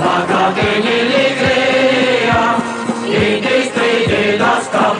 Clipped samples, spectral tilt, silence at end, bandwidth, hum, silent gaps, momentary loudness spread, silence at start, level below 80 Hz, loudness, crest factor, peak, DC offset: under 0.1%; -4.5 dB/octave; 0 s; 11 kHz; none; none; 3 LU; 0 s; -44 dBFS; -13 LUFS; 14 dB; 0 dBFS; under 0.1%